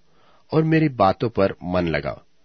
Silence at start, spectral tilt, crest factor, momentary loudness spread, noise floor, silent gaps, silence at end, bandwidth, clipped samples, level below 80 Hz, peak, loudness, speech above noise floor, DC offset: 0.5 s; -9 dB/octave; 18 dB; 7 LU; -59 dBFS; none; 0.3 s; 6.2 kHz; under 0.1%; -48 dBFS; -4 dBFS; -21 LUFS; 38 dB; 0.2%